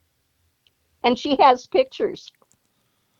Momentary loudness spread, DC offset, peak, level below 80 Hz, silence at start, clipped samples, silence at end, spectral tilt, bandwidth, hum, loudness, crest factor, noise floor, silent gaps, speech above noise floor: 11 LU; under 0.1%; -2 dBFS; -60 dBFS; 1.05 s; under 0.1%; 1 s; -4 dB/octave; 7.6 kHz; none; -20 LUFS; 20 dB; -68 dBFS; none; 49 dB